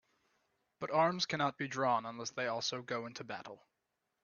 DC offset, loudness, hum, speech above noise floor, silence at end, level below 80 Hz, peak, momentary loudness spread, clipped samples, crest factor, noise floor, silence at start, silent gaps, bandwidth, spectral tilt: under 0.1%; -36 LUFS; none; 49 dB; 0.65 s; -82 dBFS; -18 dBFS; 14 LU; under 0.1%; 20 dB; -85 dBFS; 0.8 s; none; 7.2 kHz; -2.5 dB/octave